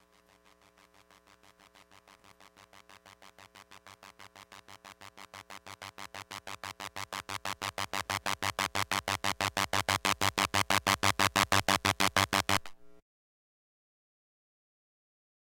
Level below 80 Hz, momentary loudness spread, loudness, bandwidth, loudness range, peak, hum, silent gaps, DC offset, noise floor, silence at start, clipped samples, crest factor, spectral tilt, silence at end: -64 dBFS; 24 LU; -30 LUFS; 17 kHz; 21 LU; -8 dBFS; none; none; under 0.1%; -64 dBFS; 2.9 s; under 0.1%; 28 dB; -2 dB/octave; 2.55 s